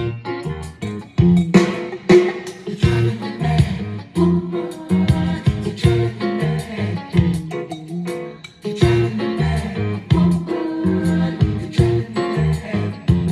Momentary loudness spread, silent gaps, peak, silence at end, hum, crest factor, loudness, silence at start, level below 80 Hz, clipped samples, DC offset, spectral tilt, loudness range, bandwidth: 12 LU; none; 0 dBFS; 0 s; none; 18 dB; -19 LUFS; 0 s; -36 dBFS; under 0.1%; under 0.1%; -7.5 dB/octave; 4 LU; 12 kHz